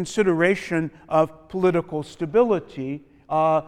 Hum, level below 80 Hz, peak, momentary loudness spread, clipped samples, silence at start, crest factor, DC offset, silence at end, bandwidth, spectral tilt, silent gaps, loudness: none; -56 dBFS; -6 dBFS; 12 LU; under 0.1%; 0 s; 16 dB; under 0.1%; 0 s; 12.5 kHz; -6.5 dB/octave; none; -23 LUFS